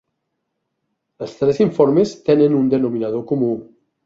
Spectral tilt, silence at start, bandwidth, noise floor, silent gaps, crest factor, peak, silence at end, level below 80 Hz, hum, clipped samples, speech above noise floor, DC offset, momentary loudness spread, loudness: -8 dB/octave; 1.2 s; 7.6 kHz; -75 dBFS; none; 16 dB; -2 dBFS; 0.4 s; -58 dBFS; none; under 0.1%; 58 dB; under 0.1%; 11 LU; -17 LUFS